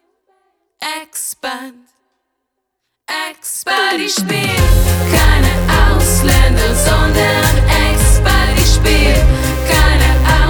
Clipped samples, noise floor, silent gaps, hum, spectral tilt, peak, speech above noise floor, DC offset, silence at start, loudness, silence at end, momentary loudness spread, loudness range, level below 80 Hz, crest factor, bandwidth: under 0.1%; -73 dBFS; none; none; -4 dB/octave; 0 dBFS; 61 dB; under 0.1%; 0.8 s; -13 LUFS; 0 s; 11 LU; 12 LU; -14 dBFS; 12 dB; over 20 kHz